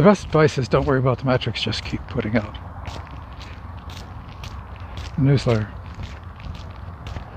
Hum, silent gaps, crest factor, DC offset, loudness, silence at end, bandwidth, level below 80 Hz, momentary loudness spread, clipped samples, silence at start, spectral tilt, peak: none; none; 20 dB; under 0.1%; -21 LUFS; 0 s; 9.2 kHz; -38 dBFS; 18 LU; under 0.1%; 0 s; -7 dB/octave; -2 dBFS